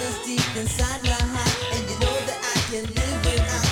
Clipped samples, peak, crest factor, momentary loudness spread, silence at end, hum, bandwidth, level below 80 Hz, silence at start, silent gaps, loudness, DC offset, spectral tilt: under 0.1%; -8 dBFS; 16 dB; 3 LU; 0 s; none; 17.5 kHz; -30 dBFS; 0 s; none; -24 LUFS; under 0.1%; -3.5 dB/octave